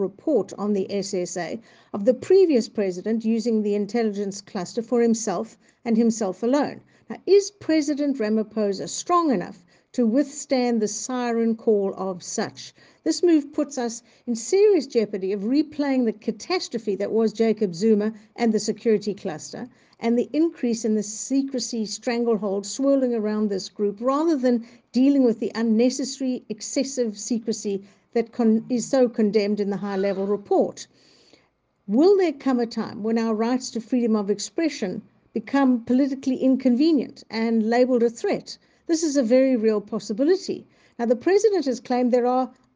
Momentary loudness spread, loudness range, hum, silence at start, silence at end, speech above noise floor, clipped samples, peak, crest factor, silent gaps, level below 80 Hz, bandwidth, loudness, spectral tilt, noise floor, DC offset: 11 LU; 3 LU; none; 0 s; 0.25 s; 43 dB; under 0.1%; -6 dBFS; 16 dB; none; -70 dBFS; 9.8 kHz; -23 LUFS; -5 dB/octave; -65 dBFS; under 0.1%